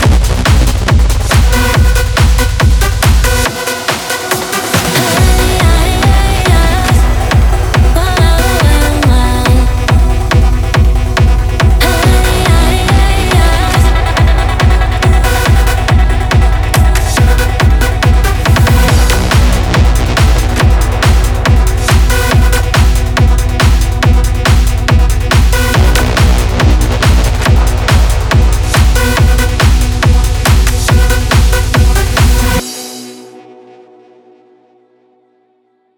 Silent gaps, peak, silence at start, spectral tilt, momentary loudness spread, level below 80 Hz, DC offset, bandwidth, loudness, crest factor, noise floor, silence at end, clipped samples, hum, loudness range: none; 0 dBFS; 0 s; -5 dB/octave; 2 LU; -10 dBFS; under 0.1%; 19 kHz; -10 LUFS; 8 dB; -55 dBFS; 2.55 s; under 0.1%; none; 1 LU